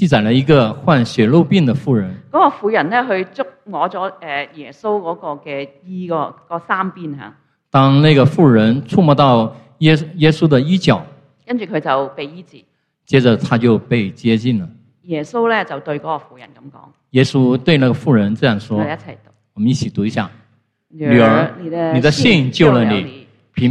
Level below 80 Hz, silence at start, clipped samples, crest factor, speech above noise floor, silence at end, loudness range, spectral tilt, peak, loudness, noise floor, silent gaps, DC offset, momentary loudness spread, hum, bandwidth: -50 dBFS; 0 s; under 0.1%; 16 dB; 43 dB; 0 s; 8 LU; -7 dB/octave; 0 dBFS; -15 LUFS; -58 dBFS; none; under 0.1%; 14 LU; none; 9.8 kHz